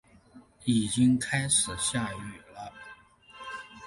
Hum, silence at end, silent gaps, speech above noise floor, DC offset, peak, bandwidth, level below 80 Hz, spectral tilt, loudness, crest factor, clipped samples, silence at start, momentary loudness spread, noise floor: none; 0 s; none; 28 dB; under 0.1%; -12 dBFS; 11.5 kHz; -56 dBFS; -3.5 dB/octave; -27 LUFS; 18 dB; under 0.1%; 0.35 s; 20 LU; -55 dBFS